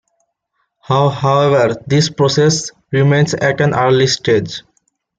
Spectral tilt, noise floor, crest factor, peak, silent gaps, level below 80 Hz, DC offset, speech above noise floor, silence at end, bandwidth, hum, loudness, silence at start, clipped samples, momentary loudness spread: -5 dB/octave; -68 dBFS; 12 dB; -2 dBFS; none; -50 dBFS; under 0.1%; 55 dB; 0.6 s; 9 kHz; none; -14 LUFS; 0.9 s; under 0.1%; 6 LU